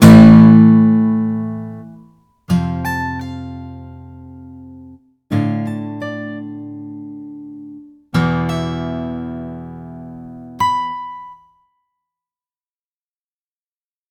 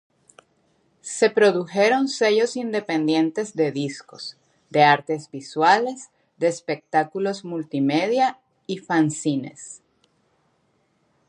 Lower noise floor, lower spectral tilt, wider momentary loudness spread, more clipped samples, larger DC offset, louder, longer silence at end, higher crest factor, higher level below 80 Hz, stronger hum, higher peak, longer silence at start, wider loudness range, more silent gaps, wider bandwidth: first, under -90 dBFS vs -67 dBFS; first, -7.5 dB/octave vs -4.5 dB/octave; first, 26 LU vs 17 LU; first, 0.4% vs under 0.1%; neither; first, -14 LUFS vs -22 LUFS; first, 2.75 s vs 1.55 s; about the same, 16 dB vs 20 dB; first, -40 dBFS vs -76 dBFS; neither; about the same, 0 dBFS vs -2 dBFS; second, 0 s vs 1.05 s; first, 10 LU vs 4 LU; neither; first, 14.5 kHz vs 11.5 kHz